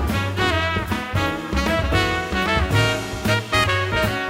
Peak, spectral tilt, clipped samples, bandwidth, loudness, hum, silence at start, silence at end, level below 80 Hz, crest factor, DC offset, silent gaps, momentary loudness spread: -6 dBFS; -5 dB/octave; under 0.1%; 16 kHz; -20 LUFS; none; 0 s; 0 s; -32 dBFS; 16 dB; under 0.1%; none; 4 LU